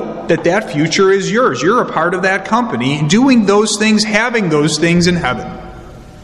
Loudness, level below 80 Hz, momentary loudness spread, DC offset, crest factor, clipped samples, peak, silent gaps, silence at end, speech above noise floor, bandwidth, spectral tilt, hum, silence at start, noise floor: -13 LUFS; -42 dBFS; 7 LU; under 0.1%; 14 dB; under 0.1%; 0 dBFS; none; 0 s; 21 dB; 12 kHz; -4.5 dB/octave; none; 0 s; -33 dBFS